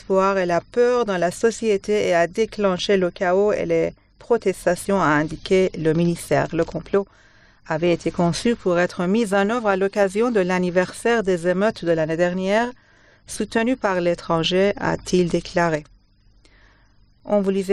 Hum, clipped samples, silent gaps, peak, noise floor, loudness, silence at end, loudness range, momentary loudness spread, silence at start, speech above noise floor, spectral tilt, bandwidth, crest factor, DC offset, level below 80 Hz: 50 Hz at -50 dBFS; under 0.1%; none; -6 dBFS; -55 dBFS; -21 LUFS; 0 s; 2 LU; 4 LU; 0.1 s; 35 dB; -5.5 dB/octave; 13 kHz; 14 dB; 0.1%; -48 dBFS